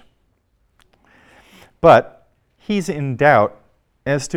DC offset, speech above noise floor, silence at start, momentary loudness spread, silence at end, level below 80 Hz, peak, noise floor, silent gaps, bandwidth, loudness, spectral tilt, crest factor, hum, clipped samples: under 0.1%; 48 dB; 1.85 s; 18 LU; 0 s; -50 dBFS; 0 dBFS; -63 dBFS; none; 14.5 kHz; -16 LUFS; -6 dB/octave; 20 dB; none; under 0.1%